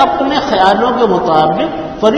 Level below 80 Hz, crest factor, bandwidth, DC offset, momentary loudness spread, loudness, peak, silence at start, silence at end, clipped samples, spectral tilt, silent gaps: -40 dBFS; 12 dB; 9.2 kHz; under 0.1%; 5 LU; -12 LUFS; 0 dBFS; 0 s; 0 s; 0.3%; -5.5 dB/octave; none